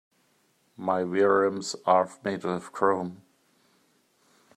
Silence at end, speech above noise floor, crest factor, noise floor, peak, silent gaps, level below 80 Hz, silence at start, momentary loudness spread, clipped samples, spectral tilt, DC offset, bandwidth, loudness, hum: 1.4 s; 42 dB; 22 dB; -68 dBFS; -6 dBFS; none; -76 dBFS; 0.8 s; 10 LU; under 0.1%; -5 dB/octave; under 0.1%; 11.5 kHz; -26 LUFS; none